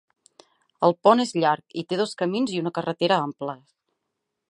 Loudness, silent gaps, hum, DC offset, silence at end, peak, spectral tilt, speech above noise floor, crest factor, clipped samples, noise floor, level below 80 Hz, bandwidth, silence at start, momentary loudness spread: -23 LUFS; none; none; under 0.1%; 0.95 s; -2 dBFS; -5.5 dB/octave; 58 dB; 22 dB; under 0.1%; -81 dBFS; -76 dBFS; 11.5 kHz; 0.8 s; 12 LU